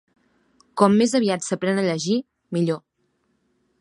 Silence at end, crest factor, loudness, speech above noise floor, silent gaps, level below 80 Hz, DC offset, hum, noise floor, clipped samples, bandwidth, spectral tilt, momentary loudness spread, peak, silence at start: 1.05 s; 22 dB; -22 LUFS; 49 dB; none; -68 dBFS; under 0.1%; none; -69 dBFS; under 0.1%; 11.5 kHz; -5.5 dB/octave; 11 LU; -2 dBFS; 0.75 s